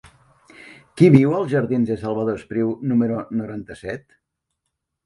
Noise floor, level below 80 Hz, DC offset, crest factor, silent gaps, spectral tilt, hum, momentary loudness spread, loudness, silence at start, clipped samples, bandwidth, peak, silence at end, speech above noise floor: -79 dBFS; -56 dBFS; under 0.1%; 20 dB; none; -9 dB/octave; none; 19 LU; -19 LUFS; 0.65 s; under 0.1%; 11.5 kHz; 0 dBFS; 1.1 s; 59 dB